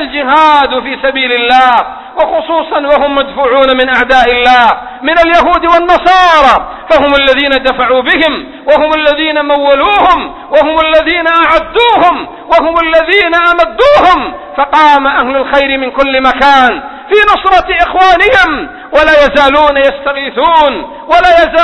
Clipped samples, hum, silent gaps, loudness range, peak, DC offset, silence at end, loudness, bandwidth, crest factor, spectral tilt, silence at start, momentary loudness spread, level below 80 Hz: 2%; none; none; 2 LU; 0 dBFS; 0.3%; 0 s; -7 LUFS; 11 kHz; 8 dB; -4 dB/octave; 0 s; 7 LU; -32 dBFS